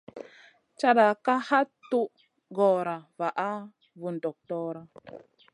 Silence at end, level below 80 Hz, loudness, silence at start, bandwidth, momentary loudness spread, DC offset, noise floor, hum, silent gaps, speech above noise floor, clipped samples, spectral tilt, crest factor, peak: 0.35 s; -80 dBFS; -27 LUFS; 0.15 s; 11 kHz; 23 LU; under 0.1%; -57 dBFS; none; none; 30 dB; under 0.1%; -6 dB/octave; 22 dB; -8 dBFS